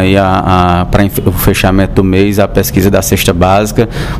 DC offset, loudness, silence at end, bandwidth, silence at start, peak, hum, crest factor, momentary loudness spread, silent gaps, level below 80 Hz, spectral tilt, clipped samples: 0.6%; -9 LUFS; 0 s; 16.5 kHz; 0 s; 0 dBFS; none; 8 dB; 2 LU; none; -22 dBFS; -5.5 dB/octave; 0.3%